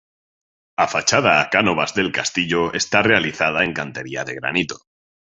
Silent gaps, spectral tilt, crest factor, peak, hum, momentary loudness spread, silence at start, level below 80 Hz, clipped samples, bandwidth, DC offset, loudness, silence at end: none; -3 dB/octave; 20 dB; -2 dBFS; none; 12 LU; 0.8 s; -52 dBFS; under 0.1%; 8.2 kHz; under 0.1%; -18 LUFS; 0.45 s